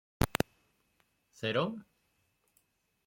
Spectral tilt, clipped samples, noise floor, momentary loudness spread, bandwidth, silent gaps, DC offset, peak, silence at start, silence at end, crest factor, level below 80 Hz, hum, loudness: -5 dB/octave; under 0.1%; -76 dBFS; 6 LU; 16.5 kHz; none; under 0.1%; -8 dBFS; 0.2 s; 1.25 s; 30 dB; -50 dBFS; none; -35 LUFS